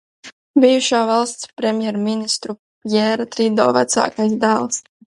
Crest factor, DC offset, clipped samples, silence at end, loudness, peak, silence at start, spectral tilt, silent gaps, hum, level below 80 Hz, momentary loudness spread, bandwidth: 18 dB; under 0.1%; under 0.1%; 0.25 s; -17 LUFS; 0 dBFS; 0.25 s; -3.5 dB/octave; 0.32-0.54 s, 2.59-2.81 s; none; -66 dBFS; 9 LU; 11.5 kHz